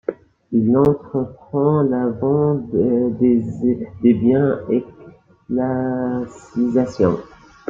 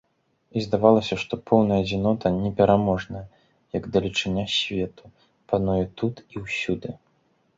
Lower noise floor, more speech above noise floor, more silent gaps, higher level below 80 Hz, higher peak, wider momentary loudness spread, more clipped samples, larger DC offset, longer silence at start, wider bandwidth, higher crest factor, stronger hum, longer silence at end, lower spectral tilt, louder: second, -45 dBFS vs -66 dBFS; second, 27 dB vs 43 dB; neither; about the same, -50 dBFS vs -48 dBFS; about the same, -2 dBFS vs -2 dBFS; second, 9 LU vs 13 LU; neither; neither; second, 0.1 s vs 0.55 s; about the same, 7.6 kHz vs 7.8 kHz; second, 16 dB vs 22 dB; neither; second, 0.45 s vs 0.6 s; first, -10 dB/octave vs -6 dB/octave; first, -19 LUFS vs -24 LUFS